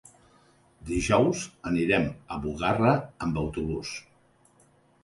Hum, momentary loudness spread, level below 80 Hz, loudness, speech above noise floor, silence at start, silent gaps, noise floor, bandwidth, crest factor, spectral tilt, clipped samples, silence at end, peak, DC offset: none; 11 LU; -46 dBFS; -27 LUFS; 35 dB; 0.8 s; none; -62 dBFS; 11.5 kHz; 20 dB; -5.5 dB/octave; under 0.1%; 1.05 s; -8 dBFS; under 0.1%